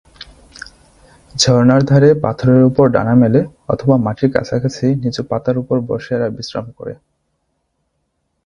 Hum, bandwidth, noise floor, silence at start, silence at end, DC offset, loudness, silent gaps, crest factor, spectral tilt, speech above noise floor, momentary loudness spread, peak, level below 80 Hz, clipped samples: none; 10.5 kHz; -68 dBFS; 0.2 s; 1.5 s; under 0.1%; -14 LUFS; none; 16 dB; -6.5 dB/octave; 55 dB; 20 LU; 0 dBFS; -46 dBFS; under 0.1%